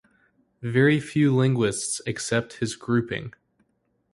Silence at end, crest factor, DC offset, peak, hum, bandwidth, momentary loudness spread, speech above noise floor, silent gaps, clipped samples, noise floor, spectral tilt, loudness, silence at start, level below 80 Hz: 0.85 s; 18 dB; under 0.1%; -6 dBFS; none; 11.5 kHz; 12 LU; 48 dB; none; under 0.1%; -71 dBFS; -5.5 dB/octave; -24 LUFS; 0.6 s; -58 dBFS